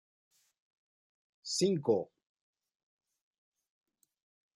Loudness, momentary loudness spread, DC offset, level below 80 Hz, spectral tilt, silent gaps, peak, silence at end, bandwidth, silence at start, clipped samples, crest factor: -32 LUFS; 19 LU; under 0.1%; -82 dBFS; -5 dB/octave; none; -18 dBFS; 2.5 s; 13.5 kHz; 1.45 s; under 0.1%; 22 dB